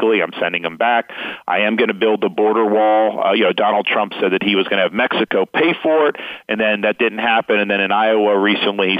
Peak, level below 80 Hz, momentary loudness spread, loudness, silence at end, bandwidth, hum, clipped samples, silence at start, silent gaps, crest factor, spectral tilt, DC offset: -4 dBFS; -66 dBFS; 5 LU; -16 LUFS; 0 s; 5 kHz; none; under 0.1%; 0 s; none; 14 dB; -7 dB/octave; under 0.1%